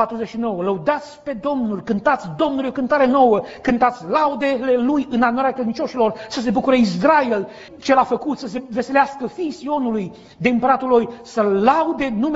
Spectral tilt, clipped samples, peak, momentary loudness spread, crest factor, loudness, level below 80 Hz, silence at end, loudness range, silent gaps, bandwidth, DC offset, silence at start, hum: -4.5 dB/octave; under 0.1%; -2 dBFS; 10 LU; 16 dB; -19 LUFS; -52 dBFS; 0 s; 3 LU; none; 8 kHz; under 0.1%; 0 s; none